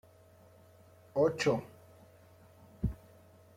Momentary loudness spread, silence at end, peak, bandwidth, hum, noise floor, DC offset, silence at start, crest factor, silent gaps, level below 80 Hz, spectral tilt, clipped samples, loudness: 19 LU; 0.6 s; -18 dBFS; 16 kHz; none; -60 dBFS; under 0.1%; 1.15 s; 20 dB; none; -52 dBFS; -6 dB/octave; under 0.1%; -33 LUFS